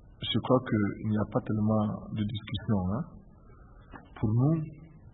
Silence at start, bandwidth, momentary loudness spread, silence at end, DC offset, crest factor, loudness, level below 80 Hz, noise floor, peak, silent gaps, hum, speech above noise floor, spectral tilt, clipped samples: 0.05 s; 4.1 kHz; 16 LU; 0.05 s; under 0.1%; 20 dB; -30 LUFS; -52 dBFS; -53 dBFS; -10 dBFS; none; none; 24 dB; -11.5 dB/octave; under 0.1%